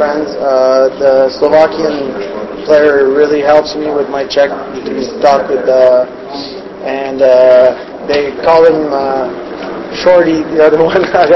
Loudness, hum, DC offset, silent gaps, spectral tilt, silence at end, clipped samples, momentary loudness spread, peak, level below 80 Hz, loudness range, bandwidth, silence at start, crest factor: -10 LUFS; none; under 0.1%; none; -5.5 dB/octave; 0 s; 0.9%; 13 LU; 0 dBFS; -44 dBFS; 2 LU; 6.6 kHz; 0 s; 10 dB